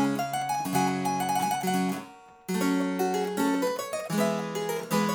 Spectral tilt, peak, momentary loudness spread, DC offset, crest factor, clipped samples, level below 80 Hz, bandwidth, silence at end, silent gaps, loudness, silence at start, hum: -5 dB/octave; -12 dBFS; 5 LU; under 0.1%; 16 dB; under 0.1%; -70 dBFS; over 20 kHz; 0 s; none; -28 LUFS; 0 s; none